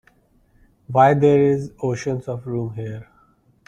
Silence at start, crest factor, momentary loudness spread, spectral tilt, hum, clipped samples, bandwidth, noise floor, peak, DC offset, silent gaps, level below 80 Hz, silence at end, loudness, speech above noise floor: 0.9 s; 18 dB; 16 LU; -8 dB/octave; none; under 0.1%; 9.2 kHz; -58 dBFS; -2 dBFS; under 0.1%; none; -54 dBFS; 0.65 s; -19 LUFS; 39 dB